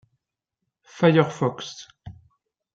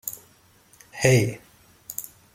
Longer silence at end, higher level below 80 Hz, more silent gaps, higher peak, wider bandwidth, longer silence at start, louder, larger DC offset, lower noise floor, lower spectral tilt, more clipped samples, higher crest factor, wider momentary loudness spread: first, 0.65 s vs 0.3 s; second, -64 dBFS vs -58 dBFS; neither; about the same, -4 dBFS vs -2 dBFS; second, 7.8 kHz vs 16.5 kHz; first, 0.95 s vs 0.05 s; first, -21 LUFS vs -24 LUFS; neither; first, -83 dBFS vs -57 dBFS; first, -6.5 dB/octave vs -5 dB/octave; neither; about the same, 22 dB vs 26 dB; about the same, 22 LU vs 23 LU